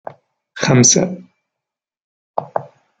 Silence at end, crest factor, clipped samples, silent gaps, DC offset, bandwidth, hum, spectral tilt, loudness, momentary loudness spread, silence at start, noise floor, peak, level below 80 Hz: 0.35 s; 18 dB; under 0.1%; 2.04-2.34 s; under 0.1%; 10 kHz; none; -3.5 dB/octave; -14 LUFS; 17 LU; 0.55 s; -84 dBFS; -2 dBFS; -58 dBFS